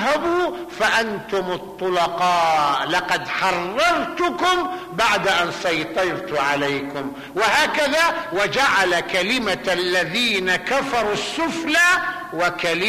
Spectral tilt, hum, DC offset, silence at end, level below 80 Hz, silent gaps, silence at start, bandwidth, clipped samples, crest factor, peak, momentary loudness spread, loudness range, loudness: -3 dB/octave; none; under 0.1%; 0 s; -52 dBFS; none; 0 s; 15 kHz; under 0.1%; 12 dB; -8 dBFS; 7 LU; 2 LU; -20 LUFS